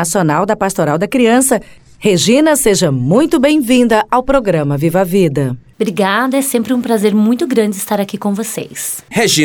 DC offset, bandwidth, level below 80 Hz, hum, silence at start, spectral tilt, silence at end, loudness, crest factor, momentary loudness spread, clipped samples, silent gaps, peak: under 0.1%; 19.5 kHz; -40 dBFS; none; 0 s; -4.5 dB/octave; 0 s; -13 LUFS; 12 dB; 8 LU; under 0.1%; none; 0 dBFS